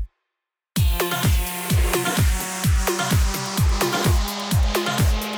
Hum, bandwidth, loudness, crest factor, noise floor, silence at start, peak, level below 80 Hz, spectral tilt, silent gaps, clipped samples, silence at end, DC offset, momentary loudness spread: none; over 20 kHz; -21 LUFS; 14 dB; -83 dBFS; 0 s; -8 dBFS; -24 dBFS; -4.5 dB/octave; none; under 0.1%; 0 s; under 0.1%; 3 LU